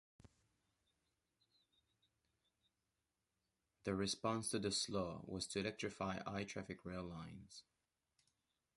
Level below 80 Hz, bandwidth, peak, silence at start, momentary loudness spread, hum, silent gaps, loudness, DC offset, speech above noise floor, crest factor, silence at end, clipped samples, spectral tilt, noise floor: -70 dBFS; 11.5 kHz; -26 dBFS; 3.85 s; 13 LU; none; none; -44 LUFS; under 0.1%; 46 dB; 22 dB; 1.15 s; under 0.1%; -4 dB/octave; -90 dBFS